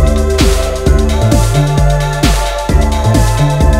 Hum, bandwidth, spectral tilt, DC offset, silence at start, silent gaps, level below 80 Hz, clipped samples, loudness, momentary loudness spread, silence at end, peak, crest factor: none; 16 kHz; -5.5 dB/octave; under 0.1%; 0 s; none; -12 dBFS; 0.5%; -12 LUFS; 2 LU; 0 s; 0 dBFS; 10 dB